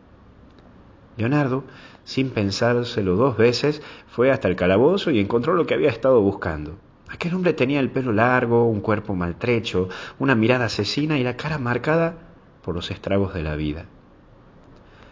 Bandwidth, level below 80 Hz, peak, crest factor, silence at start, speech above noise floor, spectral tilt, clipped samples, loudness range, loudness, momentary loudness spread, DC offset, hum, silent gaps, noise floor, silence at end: 7.6 kHz; -44 dBFS; -2 dBFS; 18 dB; 1.15 s; 29 dB; -6.5 dB/octave; under 0.1%; 5 LU; -21 LUFS; 11 LU; under 0.1%; none; none; -50 dBFS; 1.25 s